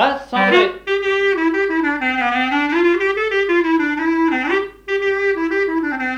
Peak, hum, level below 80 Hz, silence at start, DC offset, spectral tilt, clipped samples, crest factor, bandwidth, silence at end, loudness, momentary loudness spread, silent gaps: -2 dBFS; none; -50 dBFS; 0 s; under 0.1%; -5 dB/octave; under 0.1%; 16 dB; 8 kHz; 0 s; -17 LUFS; 5 LU; none